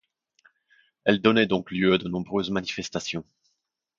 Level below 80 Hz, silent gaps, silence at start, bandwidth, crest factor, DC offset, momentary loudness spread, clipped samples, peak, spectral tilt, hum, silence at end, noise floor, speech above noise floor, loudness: -58 dBFS; none; 1.05 s; 7.6 kHz; 22 dB; under 0.1%; 10 LU; under 0.1%; -4 dBFS; -5 dB/octave; none; 0.75 s; -78 dBFS; 53 dB; -25 LUFS